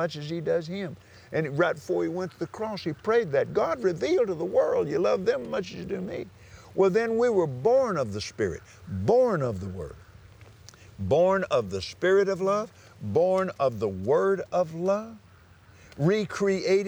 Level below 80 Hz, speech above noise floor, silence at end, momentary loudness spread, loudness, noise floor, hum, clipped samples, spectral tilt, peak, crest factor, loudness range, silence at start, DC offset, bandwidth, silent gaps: -60 dBFS; 28 dB; 0 s; 12 LU; -26 LUFS; -54 dBFS; none; under 0.1%; -6.5 dB/octave; -10 dBFS; 16 dB; 2 LU; 0 s; under 0.1%; over 20 kHz; none